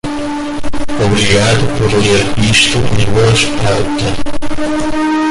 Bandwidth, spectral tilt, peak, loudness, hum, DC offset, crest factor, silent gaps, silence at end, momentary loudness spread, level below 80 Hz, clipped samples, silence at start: 11.5 kHz; -4.5 dB/octave; 0 dBFS; -12 LUFS; none; under 0.1%; 10 dB; none; 0 s; 11 LU; -28 dBFS; under 0.1%; 0.05 s